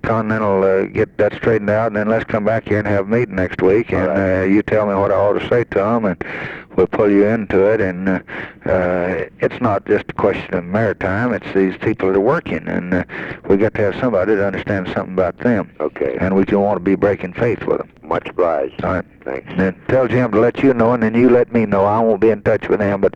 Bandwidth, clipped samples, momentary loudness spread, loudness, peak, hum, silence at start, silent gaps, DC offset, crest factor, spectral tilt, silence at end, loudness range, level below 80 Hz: 7.4 kHz; under 0.1%; 7 LU; -17 LUFS; -2 dBFS; none; 0.05 s; none; under 0.1%; 14 dB; -9 dB/octave; 0.05 s; 3 LU; -44 dBFS